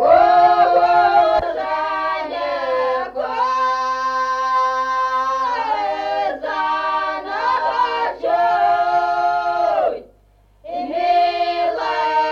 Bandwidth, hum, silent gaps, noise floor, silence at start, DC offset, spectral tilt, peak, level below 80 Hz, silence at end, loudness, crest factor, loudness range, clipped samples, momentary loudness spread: 7 kHz; none; none; -53 dBFS; 0 s; under 0.1%; -3.5 dB/octave; -2 dBFS; -52 dBFS; 0 s; -18 LUFS; 16 dB; 3 LU; under 0.1%; 9 LU